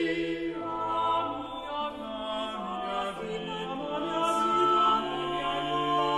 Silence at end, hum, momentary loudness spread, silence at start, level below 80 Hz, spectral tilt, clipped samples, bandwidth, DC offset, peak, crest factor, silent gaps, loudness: 0 s; none; 10 LU; 0 s; -56 dBFS; -4.5 dB/octave; under 0.1%; 13 kHz; under 0.1%; -14 dBFS; 14 dB; none; -29 LUFS